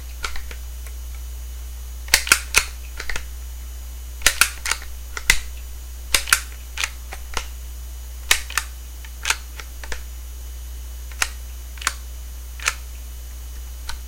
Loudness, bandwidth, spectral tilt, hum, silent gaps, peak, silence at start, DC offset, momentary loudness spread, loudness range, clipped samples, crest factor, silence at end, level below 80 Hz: -22 LUFS; 17 kHz; -0.5 dB/octave; none; none; 0 dBFS; 0 s; under 0.1%; 18 LU; 8 LU; under 0.1%; 26 dB; 0 s; -32 dBFS